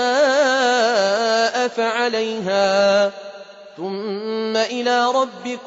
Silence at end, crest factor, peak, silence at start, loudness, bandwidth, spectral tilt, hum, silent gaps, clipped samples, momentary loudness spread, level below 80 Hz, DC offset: 0 s; 14 dB; -6 dBFS; 0 s; -18 LUFS; 8 kHz; -3 dB/octave; none; none; under 0.1%; 11 LU; -68 dBFS; under 0.1%